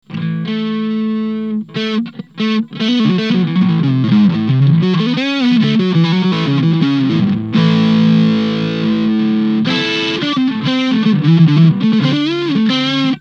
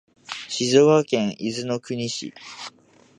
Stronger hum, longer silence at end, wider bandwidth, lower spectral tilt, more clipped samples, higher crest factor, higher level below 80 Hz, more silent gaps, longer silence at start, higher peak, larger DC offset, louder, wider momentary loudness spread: neither; second, 0 s vs 0.5 s; second, 7 kHz vs 11 kHz; first, -7.5 dB/octave vs -4.5 dB/octave; neither; second, 12 dB vs 20 dB; first, -56 dBFS vs -68 dBFS; neither; second, 0.1 s vs 0.3 s; first, 0 dBFS vs -4 dBFS; neither; first, -14 LUFS vs -22 LUFS; second, 8 LU vs 20 LU